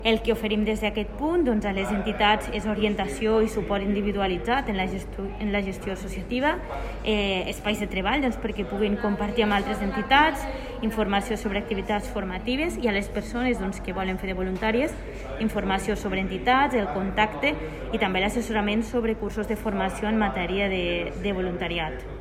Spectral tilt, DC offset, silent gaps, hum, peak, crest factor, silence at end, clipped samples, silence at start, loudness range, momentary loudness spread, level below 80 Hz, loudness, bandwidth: -5.5 dB/octave; under 0.1%; none; none; -6 dBFS; 18 dB; 0 s; under 0.1%; 0 s; 3 LU; 8 LU; -38 dBFS; -26 LUFS; 16 kHz